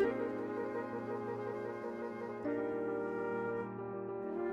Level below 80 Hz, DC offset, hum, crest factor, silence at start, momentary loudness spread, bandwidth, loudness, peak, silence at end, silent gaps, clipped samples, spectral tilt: -74 dBFS; under 0.1%; none; 16 dB; 0 s; 5 LU; 7.8 kHz; -40 LUFS; -22 dBFS; 0 s; none; under 0.1%; -8.5 dB/octave